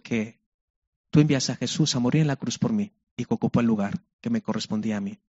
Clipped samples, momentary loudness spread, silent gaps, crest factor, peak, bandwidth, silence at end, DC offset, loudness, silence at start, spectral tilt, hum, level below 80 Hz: under 0.1%; 9 LU; 0.46-1.04 s, 3.11-3.17 s, 4.13-4.19 s; 20 dB; -6 dBFS; 8 kHz; 0.15 s; under 0.1%; -25 LUFS; 0.05 s; -6 dB/octave; none; -58 dBFS